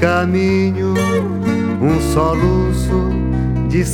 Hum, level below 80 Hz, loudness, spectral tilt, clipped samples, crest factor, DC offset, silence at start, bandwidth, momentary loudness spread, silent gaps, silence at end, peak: none; -24 dBFS; -16 LUFS; -7 dB/octave; under 0.1%; 14 dB; under 0.1%; 0 s; 16 kHz; 3 LU; none; 0 s; 0 dBFS